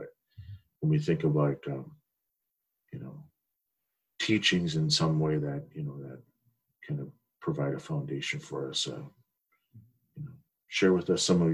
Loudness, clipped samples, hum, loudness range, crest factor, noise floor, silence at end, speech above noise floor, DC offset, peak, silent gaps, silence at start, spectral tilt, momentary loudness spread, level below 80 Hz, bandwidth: -30 LUFS; under 0.1%; none; 6 LU; 20 dB; -83 dBFS; 0 s; 54 dB; under 0.1%; -12 dBFS; none; 0 s; -5 dB/octave; 21 LU; -62 dBFS; 11.5 kHz